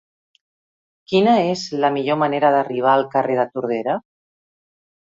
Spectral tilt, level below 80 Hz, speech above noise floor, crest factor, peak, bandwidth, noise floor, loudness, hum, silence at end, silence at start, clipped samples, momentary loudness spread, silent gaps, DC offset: -6 dB/octave; -66 dBFS; over 72 dB; 18 dB; -2 dBFS; 7.8 kHz; under -90 dBFS; -19 LUFS; none; 1.15 s; 1.1 s; under 0.1%; 7 LU; none; under 0.1%